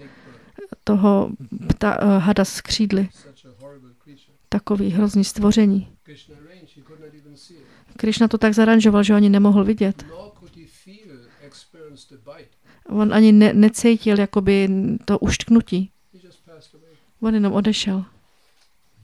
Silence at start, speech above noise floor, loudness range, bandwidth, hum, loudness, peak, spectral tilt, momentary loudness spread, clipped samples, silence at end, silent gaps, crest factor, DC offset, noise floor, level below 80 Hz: 0.6 s; 45 dB; 6 LU; 12 kHz; none; -17 LUFS; -2 dBFS; -6 dB/octave; 13 LU; under 0.1%; 1 s; none; 18 dB; 0.1%; -62 dBFS; -44 dBFS